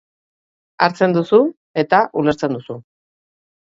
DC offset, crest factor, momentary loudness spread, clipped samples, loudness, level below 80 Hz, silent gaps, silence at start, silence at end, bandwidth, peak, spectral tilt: under 0.1%; 18 dB; 12 LU; under 0.1%; -17 LUFS; -58 dBFS; 1.57-1.74 s; 0.8 s; 0.95 s; 7.8 kHz; 0 dBFS; -7 dB/octave